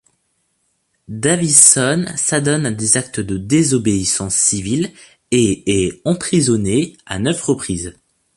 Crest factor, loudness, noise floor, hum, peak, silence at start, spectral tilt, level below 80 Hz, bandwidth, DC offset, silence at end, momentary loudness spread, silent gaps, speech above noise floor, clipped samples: 16 dB; -15 LUFS; -66 dBFS; none; 0 dBFS; 1.1 s; -3.5 dB/octave; -44 dBFS; 16 kHz; under 0.1%; 0.45 s; 13 LU; none; 50 dB; under 0.1%